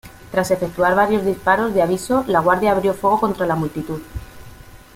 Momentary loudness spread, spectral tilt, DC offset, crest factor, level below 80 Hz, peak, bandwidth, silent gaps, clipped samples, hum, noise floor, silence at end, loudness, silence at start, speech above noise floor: 11 LU; -6 dB/octave; under 0.1%; 16 dB; -44 dBFS; -2 dBFS; 16.5 kHz; none; under 0.1%; none; -41 dBFS; 0.2 s; -18 LUFS; 0.05 s; 23 dB